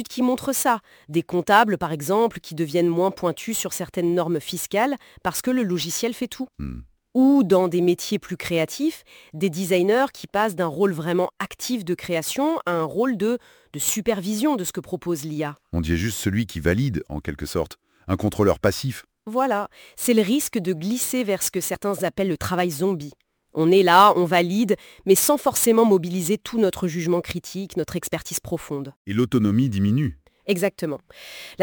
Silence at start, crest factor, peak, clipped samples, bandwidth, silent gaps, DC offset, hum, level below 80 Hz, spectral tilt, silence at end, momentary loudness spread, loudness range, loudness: 0 s; 22 dB; 0 dBFS; under 0.1%; over 20 kHz; 28.96-29.05 s; under 0.1%; none; -48 dBFS; -5 dB/octave; 0 s; 13 LU; 6 LU; -22 LUFS